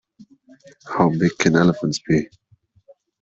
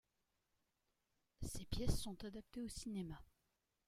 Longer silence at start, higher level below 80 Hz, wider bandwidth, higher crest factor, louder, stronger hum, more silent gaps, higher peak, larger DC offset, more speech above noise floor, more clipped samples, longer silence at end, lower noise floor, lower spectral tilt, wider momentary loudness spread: second, 0.85 s vs 1.4 s; about the same, -54 dBFS vs -54 dBFS; second, 7.8 kHz vs 16 kHz; about the same, 18 dB vs 22 dB; first, -19 LUFS vs -48 LUFS; neither; neither; first, -4 dBFS vs -24 dBFS; neither; second, 37 dB vs 43 dB; neither; first, 0.95 s vs 0.65 s; second, -56 dBFS vs -87 dBFS; about the same, -6 dB/octave vs -5 dB/octave; about the same, 10 LU vs 10 LU